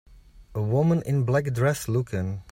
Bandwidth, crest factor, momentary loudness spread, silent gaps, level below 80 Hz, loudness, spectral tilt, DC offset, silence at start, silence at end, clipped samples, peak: 16 kHz; 14 dB; 8 LU; none; -52 dBFS; -25 LUFS; -7.5 dB/octave; under 0.1%; 0.35 s; 0.1 s; under 0.1%; -10 dBFS